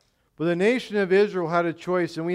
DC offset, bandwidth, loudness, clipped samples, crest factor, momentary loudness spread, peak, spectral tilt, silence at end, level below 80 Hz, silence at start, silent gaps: under 0.1%; 11.5 kHz; -23 LUFS; under 0.1%; 14 dB; 5 LU; -10 dBFS; -6.5 dB/octave; 0 s; -68 dBFS; 0.4 s; none